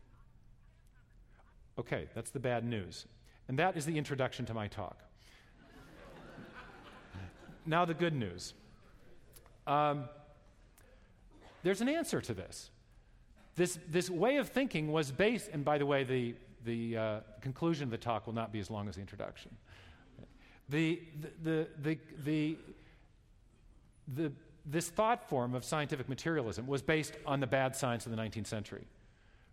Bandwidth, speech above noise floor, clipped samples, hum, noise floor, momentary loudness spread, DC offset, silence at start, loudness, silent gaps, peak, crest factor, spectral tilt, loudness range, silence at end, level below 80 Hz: 16 kHz; 28 dB; under 0.1%; none; -64 dBFS; 19 LU; under 0.1%; 0.2 s; -36 LUFS; none; -18 dBFS; 20 dB; -5.5 dB/octave; 7 LU; 0.65 s; -62 dBFS